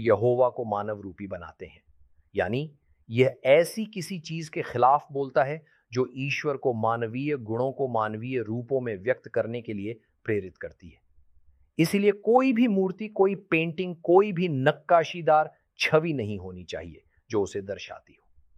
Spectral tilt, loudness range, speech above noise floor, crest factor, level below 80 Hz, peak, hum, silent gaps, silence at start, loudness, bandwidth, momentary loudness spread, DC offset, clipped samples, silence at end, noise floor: -6.5 dB/octave; 6 LU; 33 dB; 20 dB; -64 dBFS; -6 dBFS; none; none; 0 s; -26 LUFS; 15 kHz; 16 LU; under 0.1%; under 0.1%; 0.6 s; -58 dBFS